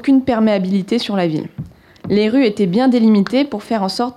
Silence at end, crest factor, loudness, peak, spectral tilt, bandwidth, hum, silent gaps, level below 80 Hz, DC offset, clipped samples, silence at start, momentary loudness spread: 0.05 s; 10 dB; -16 LUFS; -6 dBFS; -7 dB/octave; 12.5 kHz; none; none; -52 dBFS; under 0.1%; under 0.1%; 0 s; 13 LU